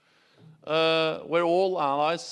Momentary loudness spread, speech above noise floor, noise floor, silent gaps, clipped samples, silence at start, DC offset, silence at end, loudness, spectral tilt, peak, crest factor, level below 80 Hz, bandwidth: 4 LU; 32 dB; -56 dBFS; none; under 0.1%; 0.65 s; under 0.1%; 0 s; -25 LUFS; -4.5 dB/octave; -10 dBFS; 16 dB; -78 dBFS; 11 kHz